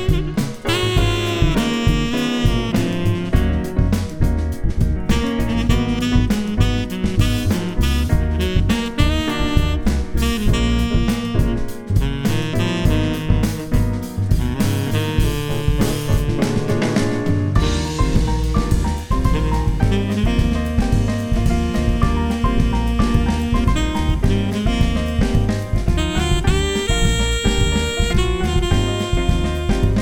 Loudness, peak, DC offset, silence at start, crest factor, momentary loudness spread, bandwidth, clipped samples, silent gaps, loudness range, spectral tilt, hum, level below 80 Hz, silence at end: -19 LUFS; 0 dBFS; under 0.1%; 0 s; 16 dB; 3 LU; 17.5 kHz; under 0.1%; none; 1 LU; -6 dB/octave; none; -22 dBFS; 0 s